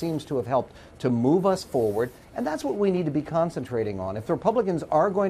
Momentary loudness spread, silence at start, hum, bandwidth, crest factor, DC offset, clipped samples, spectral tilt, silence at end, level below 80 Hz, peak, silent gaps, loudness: 8 LU; 0 s; none; 15 kHz; 16 dB; under 0.1%; under 0.1%; -7.5 dB/octave; 0 s; -56 dBFS; -8 dBFS; none; -26 LUFS